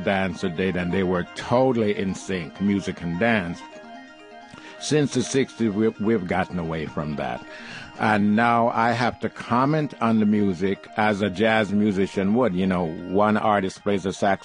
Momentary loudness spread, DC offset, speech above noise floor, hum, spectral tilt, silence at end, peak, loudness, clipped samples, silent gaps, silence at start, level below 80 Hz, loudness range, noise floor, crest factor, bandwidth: 12 LU; under 0.1%; 22 dB; none; -6 dB/octave; 0 s; -4 dBFS; -23 LUFS; under 0.1%; none; 0 s; -50 dBFS; 4 LU; -44 dBFS; 18 dB; 10.5 kHz